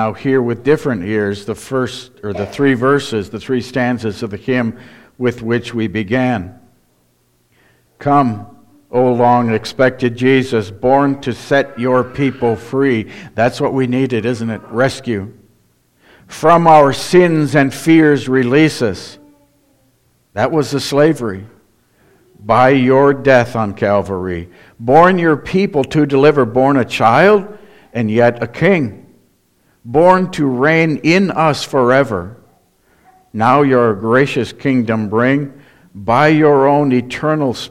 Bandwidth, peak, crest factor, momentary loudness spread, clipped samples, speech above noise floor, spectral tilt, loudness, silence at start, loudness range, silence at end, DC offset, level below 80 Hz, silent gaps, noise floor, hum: 14.5 kHz; 0 dBFS; 14 dB; 12 LU; under 0.1%; 45 dB; -6.5 dB/octave; -14 LUFS; 0 s; 7 LU; 0 s; under 0.1%; -48 dBFS; none; -58 dBFS; none